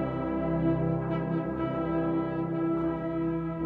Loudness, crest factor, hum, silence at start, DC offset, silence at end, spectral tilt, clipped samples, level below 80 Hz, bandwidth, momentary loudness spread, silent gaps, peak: -30 LUFS; 14 dB; none; 0 s; under 0.1%; 0 s; -11 dB/octave; under 0.1%; -48 dBFS; 4.2 kHz; 3 LU; none; -14 dBFS